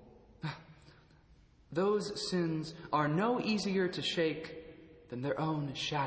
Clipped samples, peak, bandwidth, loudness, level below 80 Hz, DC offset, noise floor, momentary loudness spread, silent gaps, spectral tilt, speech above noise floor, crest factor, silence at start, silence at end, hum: under 0.1%; -18 dBFS; 8 kHz; -34 LUFS; -66 dBFS; under 0.1%; -63 dBFS; 14 LU; none; -5.5 dB/octave; 29 dB; 18 dB; 0 s; 0 s; none